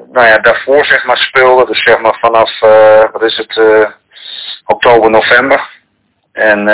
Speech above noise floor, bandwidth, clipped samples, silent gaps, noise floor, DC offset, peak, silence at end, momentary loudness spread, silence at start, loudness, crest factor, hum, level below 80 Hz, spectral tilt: 52 dB; 4 kHz; 6%; none; -59 dBFS; under 0.1%; 0 dBFS; 0 s; 10 LU; 0 s; -7 LUFS; 8 dB; none; -46 dBFS; -7.5 dB/octave